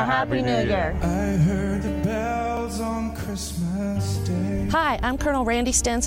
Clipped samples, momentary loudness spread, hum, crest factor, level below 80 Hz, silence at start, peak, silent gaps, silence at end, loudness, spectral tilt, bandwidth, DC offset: under 0.1%; 6 LU; none; 14 dB; -34 dBFS; 0 s; -8 dBFS; none; 0 s; -24 LUFS; -5 dB/octave; 16.5 kHz; under 0.1%